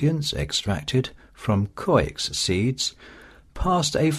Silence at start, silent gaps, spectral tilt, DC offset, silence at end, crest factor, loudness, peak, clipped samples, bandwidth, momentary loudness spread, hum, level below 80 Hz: 0 s; none; -4.5 dB/octave; under 0.1%; 0 s; 18 dB; -24 LUFS; -6 dBFS; under 0.1%; 13.5 kHz; 6 LU; none; -40 dBFS